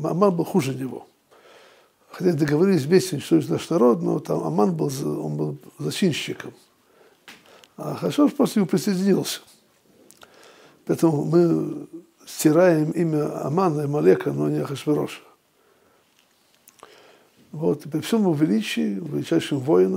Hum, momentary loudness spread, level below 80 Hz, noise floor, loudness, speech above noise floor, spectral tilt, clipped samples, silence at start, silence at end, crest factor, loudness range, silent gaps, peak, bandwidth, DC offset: none; 13 LU; -70 dBFS; -61 dBFS; -22 LUFS; 40 dB; -6.5 dB/octave; under 0.1%; 0 s; 0 s; 20 dB; 7 LU; none; -4 dBFS; 16 kHz; under 0.1%